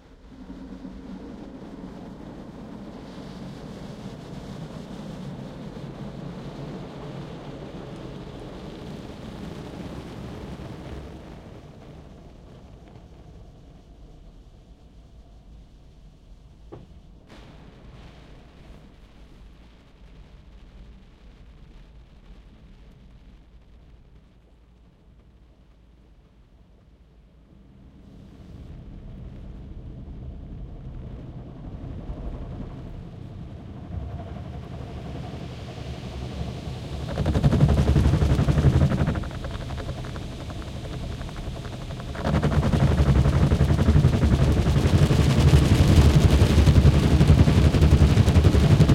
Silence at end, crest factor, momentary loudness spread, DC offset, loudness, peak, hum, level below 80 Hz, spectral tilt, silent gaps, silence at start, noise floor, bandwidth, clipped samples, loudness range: 0 s; 20 dB; 23 LU; under 0.1%; -22 LUFS; -4 dBFS; none; -32 dBFS; -7 dB/octave; none; 0.25 s; -53 dBFS; 13.5 kHz; under 0.1%; 23 LU